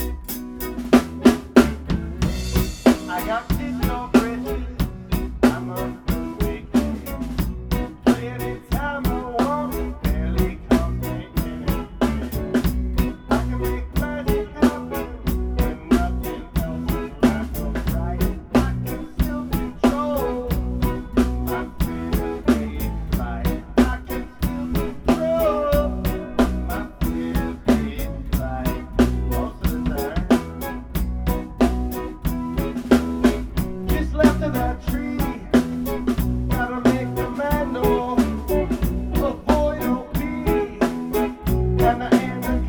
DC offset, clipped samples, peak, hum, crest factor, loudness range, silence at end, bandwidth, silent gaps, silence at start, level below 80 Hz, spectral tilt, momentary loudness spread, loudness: under 0.1%; under 0.1%; 0 dBFS; none; 22 dB; 3 LU; 0 s; over 20 kHz; none; 0 s; -28 dBFS; -6.5 dB/octave; 8 LU; -23 LUFS